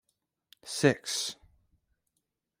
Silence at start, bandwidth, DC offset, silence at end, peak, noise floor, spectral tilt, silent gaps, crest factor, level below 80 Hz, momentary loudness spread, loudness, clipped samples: 0.65 s; 16 kHz; under 0.1%; 1.25 s; -8 dBFS; -83 dBFS; -4 dB/octave; none; 26 dB; -70 dBFS; 24 LU; -30 LUFS; under 0.1%